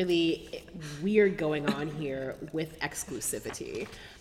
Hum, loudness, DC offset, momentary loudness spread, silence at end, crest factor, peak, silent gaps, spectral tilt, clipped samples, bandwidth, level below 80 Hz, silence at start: none; -31 LUFS; under 0.1%; 14 LU; 0 s; 20 dB; -12 dBFS; none; -4.5 dB/octave; under 0.1%; 16 kHz; -56 dBFS; 0 s